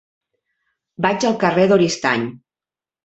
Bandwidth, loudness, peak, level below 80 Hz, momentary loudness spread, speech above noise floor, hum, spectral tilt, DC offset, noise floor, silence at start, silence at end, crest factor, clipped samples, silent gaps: 8.2 kHz; -17 LUFS; -2 dBFS; -60 dBFS; 8 LU; over 73 dB; none; -5 dB/octave; under 0.1%; under -90 dBFS; 1 s; 0.7 s; 18 dB; under 0.1%; none